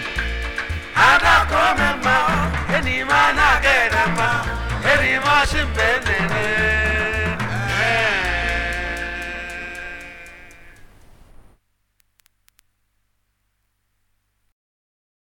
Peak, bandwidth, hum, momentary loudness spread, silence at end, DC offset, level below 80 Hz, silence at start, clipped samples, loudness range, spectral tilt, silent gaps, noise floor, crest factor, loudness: 0 dBFS; 18.5 kHz; 50 Hz at -60 dBFS; 14 LU; 4.5 s; under 0.1%; -32 dBFS; 0 s; under 0.1%; 15 LU; -4 dB/octave; none; -69 dBFS; 20 dB; -18 LUFS